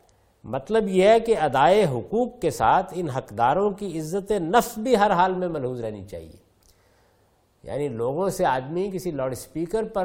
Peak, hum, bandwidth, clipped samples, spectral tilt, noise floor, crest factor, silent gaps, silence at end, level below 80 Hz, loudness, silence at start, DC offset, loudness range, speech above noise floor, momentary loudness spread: -4 dBFS; none; 16.5 kHz; under 0.1%; -5.5 dB/octave; -63 dBFS; 20 dB; none; 0 s; -50 dBFS; -23 LUFS; 0.45 s; under 0.1%; 8 LU; 40 dB; 13 LU